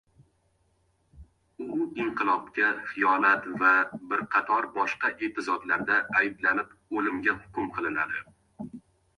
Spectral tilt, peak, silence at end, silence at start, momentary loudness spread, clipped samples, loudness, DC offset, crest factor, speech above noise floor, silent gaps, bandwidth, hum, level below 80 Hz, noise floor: -5.5 dB/octave; -8 dBFS; 0.4 s; 1.15 s; 11 LU; under 0.1%; -27 LUFS; under 0.1%; 20 dB; 42 dB; none; 11 kHz; none; -64 dBFS; -70 dBFS